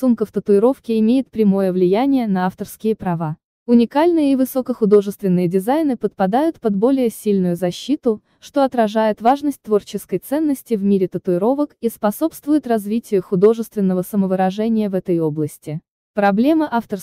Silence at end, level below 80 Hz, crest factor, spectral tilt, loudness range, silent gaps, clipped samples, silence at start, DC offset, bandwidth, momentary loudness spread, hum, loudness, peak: 0 s; -58 dBFS; 14 dB; -7.5 dB/octave; 2 LU; 3.45-3.66 s, 15.90-16.14 s; under 0.1%; 0 s; under 0.1%; 16 kHz; 7 LU; none; -18 LUFS; -2 dBFS